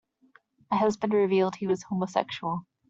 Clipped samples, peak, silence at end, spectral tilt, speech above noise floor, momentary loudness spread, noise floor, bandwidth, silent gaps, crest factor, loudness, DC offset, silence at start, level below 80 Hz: under 0.1%; -10 dBFS; 0.3 s; -6.5 dB/octave; 36 dB; 8 LU; -62 dBFS; 7.8 kHz; none; 18 dB; -27 LUFS; under 0.1%; 0.7 s; -68 dBFS